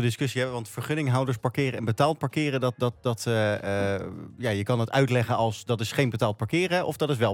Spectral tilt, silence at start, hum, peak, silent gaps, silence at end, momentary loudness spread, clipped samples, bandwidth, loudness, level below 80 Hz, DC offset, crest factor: -6 dB/octave; 0 s; none; -8 dBFS; none; 0 s; 5 LU; under 0.1%; 17 kHz; -26 LUFS; -64 dBFS; under 0.1%; 18 dB